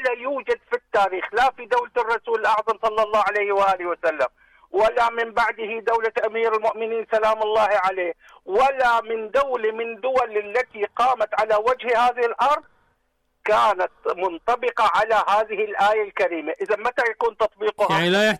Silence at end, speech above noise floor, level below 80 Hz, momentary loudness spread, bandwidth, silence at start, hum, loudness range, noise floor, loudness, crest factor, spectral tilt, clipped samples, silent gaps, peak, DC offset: 0 s; 49 dB; -56 dBFS; 7 LU; 14.5 kHz; 0 s; none; 1 LU; -70 dBFS; -21 LUFS; 10 dB; -4 dB/octave; under 0.1%; none; -12 dBFS; under 0.1%